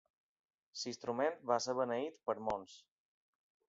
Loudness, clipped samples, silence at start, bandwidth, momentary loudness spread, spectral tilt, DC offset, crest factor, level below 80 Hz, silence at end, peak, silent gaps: -39 LUFS; under 0.1%; 0.75 s; 7.6 kHz; 9 LU; -3 dB/octave; under 0.1%; 22 dB; -76 dBFS; 0.9 s; -18 dBFS; none